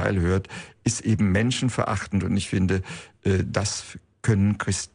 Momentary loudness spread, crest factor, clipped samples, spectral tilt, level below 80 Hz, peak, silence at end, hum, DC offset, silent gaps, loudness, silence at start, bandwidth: 8 LU; 16 dB; under 0.1%; -5.5 dB/octave; -46 dBFS; -8 dBFS; 0.1 s; none; under 0.1%; none; -24 LUFS; 0 s; 10.5 kHz